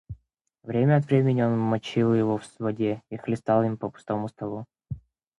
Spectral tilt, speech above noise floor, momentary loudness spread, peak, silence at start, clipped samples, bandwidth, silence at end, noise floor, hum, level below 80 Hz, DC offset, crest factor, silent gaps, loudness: -8.5 dB/octave; 40 dB; 19 LU; -8 dBFS; 0.1 s; under 0.1%; 10.5 kHz; 0.4 s; -64 dBFS; none; -56 dBFS; under 0.1%; 18 dB; none; -25 LUFS